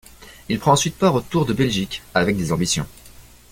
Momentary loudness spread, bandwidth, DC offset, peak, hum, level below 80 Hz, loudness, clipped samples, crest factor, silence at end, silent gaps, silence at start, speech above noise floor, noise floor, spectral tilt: 7 LU; 17 kHz; under 0.1%; -2 dBFS; none; -44 dBFS; -20 LUFS; under 0.1%; 20 dB; 0.3 s; none; 0.2 s; 25 dB; -45 dBFS; -4.5 dB/octave